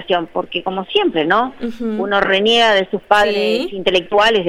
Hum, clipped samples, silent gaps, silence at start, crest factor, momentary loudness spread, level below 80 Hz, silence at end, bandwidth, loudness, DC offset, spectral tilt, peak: none; under 0.1%; none; 0 s; 16 dB; 10 LU; -46 dBFS; 0 s; 14 kHz; -16 LUFS; under 0.1%; -4 dB/octave; 0 dBFS